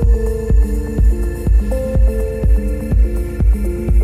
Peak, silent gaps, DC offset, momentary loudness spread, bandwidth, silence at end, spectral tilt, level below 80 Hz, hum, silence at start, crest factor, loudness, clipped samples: -4 dBFS; none; under 0.1%; 2 LU; 12.5 kHz; 0 s; -8.5 dB/octave; -14 dBFS; none; 0 s; 10 dB; -17 LUFS; under 0.1%